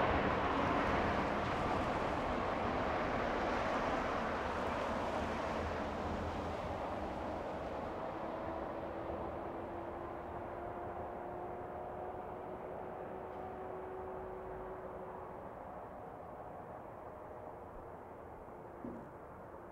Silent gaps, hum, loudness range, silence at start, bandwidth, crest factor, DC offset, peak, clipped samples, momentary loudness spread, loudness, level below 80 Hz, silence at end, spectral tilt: none; none; 13 LU; 0 s; 16 kHz; 20 dB; under 0.1%; -20 dBFS; under 0.1%; 14 LU; -40 LUFS; -54 dBFS; 0 s; -6.5 dB/octave